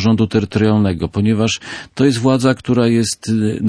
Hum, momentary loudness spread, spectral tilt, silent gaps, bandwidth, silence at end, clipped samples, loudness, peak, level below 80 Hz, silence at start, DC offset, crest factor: none; 4 LU; -6 dB/octave; none; 11 kHz; 0 s; under 0.1%; -16 LUFS; -2 dBFS; -44 dBFS; 0 s; under 0.1%; 14 dB